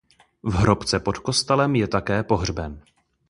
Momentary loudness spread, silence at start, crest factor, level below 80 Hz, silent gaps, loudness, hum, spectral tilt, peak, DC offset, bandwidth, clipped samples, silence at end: 10 LU; 0.45 s; 20 dB; -38 dBFS; none; -22 LUFS; none; -5 dB/octave; -2 dBFS; under 0.1%; 11.5 kHz; under 0.1%; 0.5 s